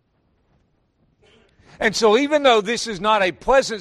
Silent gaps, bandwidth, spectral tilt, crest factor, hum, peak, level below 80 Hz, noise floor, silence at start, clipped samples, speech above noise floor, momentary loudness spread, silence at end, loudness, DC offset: none; 13 kHz; -3 dB/octave; 18 dB; none; -4 dBFS; -48 dBFS; -64 dBFS; 1.8 s; under 0.1%; 47 dB; 6 LU; 0 s; -18 LUFS; under 0.1%